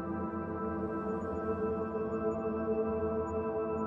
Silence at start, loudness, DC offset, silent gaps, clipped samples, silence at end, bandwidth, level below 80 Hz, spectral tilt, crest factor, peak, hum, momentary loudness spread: 0 s; -35 LUFS; under 0.1%; none; under 0.1%; 0 s; 7.4 kHz; -56 dBFS; -10 dB/octave; 12 dB; -22 dBFS; none; 4 LU